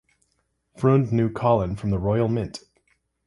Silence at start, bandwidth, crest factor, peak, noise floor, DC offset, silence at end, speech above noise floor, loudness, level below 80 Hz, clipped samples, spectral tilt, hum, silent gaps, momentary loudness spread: 0.8 s; 11.5 kHz; 18 dB; -6 dBFS; -72 dBFS; under 0.1%; 0.7 s; 50 dB; -23 LUFS; -46 dBFS; under 0.1%; -8.5 dB/octave; none; none; 8 LU